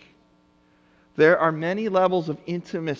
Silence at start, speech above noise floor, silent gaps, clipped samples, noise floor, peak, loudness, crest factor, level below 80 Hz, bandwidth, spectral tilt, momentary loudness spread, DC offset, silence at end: 1.15 s; 38 dB; none; under 0.1%; -60 dBFS; -4 dBFS; -22 LUFS; 20 dB; -66 dBFS; 7.4 kHz; -7 dB/octave; 13 LU; under 0.1%; 0 s